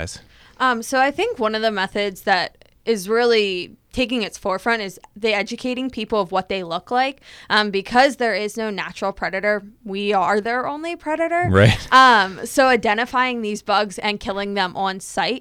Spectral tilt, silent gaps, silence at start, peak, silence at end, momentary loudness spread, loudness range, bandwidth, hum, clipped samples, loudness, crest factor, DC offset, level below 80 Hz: -4.5 dB/octave; none; 0 s; -2 dBFS; 0 s; 10 LU; 6 LU; 16 kHz; none; under 0.1%; -20 LUFS; 18 dB; under 0.1%; -48 dBFS